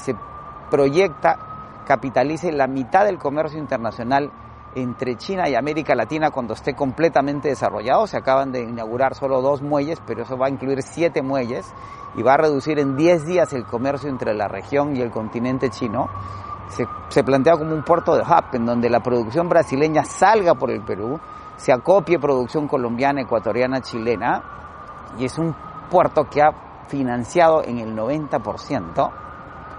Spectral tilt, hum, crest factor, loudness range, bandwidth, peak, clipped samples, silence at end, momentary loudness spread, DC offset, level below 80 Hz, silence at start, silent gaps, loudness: -6.5 dB/octave; none; 20 dB; 4 LU; 11.5 kHz; 0 dBFS; under 0.1%; 0 s; 12 LU; under 0.1%; -50 dBFS; 0 s; none; -20 LUFS